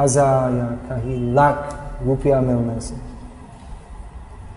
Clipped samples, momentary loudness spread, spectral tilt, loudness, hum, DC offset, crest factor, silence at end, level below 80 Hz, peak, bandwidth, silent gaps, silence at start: under 0.1%; 23 LU; -6.5 dB/octave; -20 LUFS; none; under 0.1%; 18 dB; 0 s; -36 dBFS; -2 dBFS; 10.5 kHz; none; 0 s